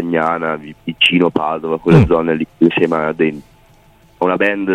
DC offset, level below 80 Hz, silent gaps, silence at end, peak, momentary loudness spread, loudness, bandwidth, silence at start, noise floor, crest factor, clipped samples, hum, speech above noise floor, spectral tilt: under 0.1%; -38 dBFS; none; 0 s; 0 dBFS; 9 LU; -15 LUFS; 9.8 kHz; 0 s; -48 dBFS; 16 dB; under 0.1%; none; 33 dB; -7 dB/octave